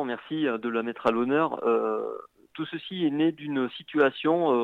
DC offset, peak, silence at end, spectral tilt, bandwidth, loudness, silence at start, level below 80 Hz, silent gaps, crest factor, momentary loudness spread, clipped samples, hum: under 0.1%; -10 dBFS; 0 s; -7.5 dB/octave; 4.9 kHz; -27 LUFS; 0 s; -74 dBFS; none; 16 dB; 11 LU; under 0.1%; none